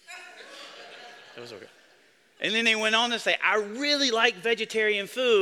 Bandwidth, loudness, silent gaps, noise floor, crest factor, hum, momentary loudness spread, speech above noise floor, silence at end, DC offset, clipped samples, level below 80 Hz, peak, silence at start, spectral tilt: 15 kHz; -24 LUFS; none; -60 dBFS; 22 dB; none; 22 LU; 35 dB; 0 s; under 0.1%; under 0.1%; -76 dBFS; -6 dBFS; 0.1 s; -1.5 dB/octave